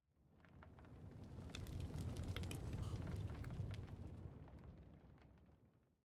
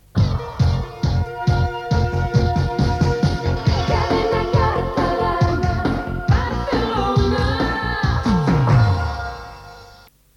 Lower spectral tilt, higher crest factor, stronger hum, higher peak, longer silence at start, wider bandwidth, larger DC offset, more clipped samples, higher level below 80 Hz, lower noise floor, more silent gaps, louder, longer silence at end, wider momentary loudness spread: about the same, -6 dB/octave vs -7 dB/octave; about the same, 18 dB vs 14 dB; neither; second, -32 dBFS vs -4 dBFS; about the same, 0.2 s vs 0.15 s; first, 15 kHz vs 11 kHz; neither; neither; second, -60 dBFS vs -28 dBFS; first, -74 dBFS vs -47 dBFS; neither; second, -51 LUFS vs -19 LUFS; second, 0.35 s vs 0.5 s; first, 17 LU vs 5 LU